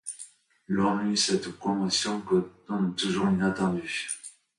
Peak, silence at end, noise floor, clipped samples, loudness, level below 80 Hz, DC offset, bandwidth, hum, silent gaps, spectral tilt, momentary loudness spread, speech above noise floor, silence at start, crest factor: -12 dBFS; 0.3 s; -50 dBFS; under 0.1%; -27 LUFS; -60 dBFS; under 0.1%; 11.5 kHz; none; none; -4 dB/octave; 10 LU; 23 dB; 0.05 s; 16 dB